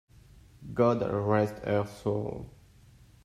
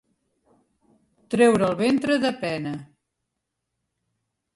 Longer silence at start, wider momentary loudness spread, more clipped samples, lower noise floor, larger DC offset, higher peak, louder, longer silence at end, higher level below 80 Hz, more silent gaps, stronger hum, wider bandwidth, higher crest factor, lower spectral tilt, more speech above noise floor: second, 0.35 s vs 1.3 s; first, 17 LU vs 13 LU; neither; second, -56 dBFS vs -81 dBFS; neither; second, -12 dBFS vs -6 dBFS; second, -29 LUFS vs -22 LUFS; second, 0.75 s vs 1.7 s; first, -56 dBFS vs -64 dBFS; neither; neither; first, 13.5 kHz vs 11.5 kHz; about the same, 20 dB vs 20 dB; first, -8 dB/octave vs -5.5 dB/octave; second, 28 dB vs 60 dB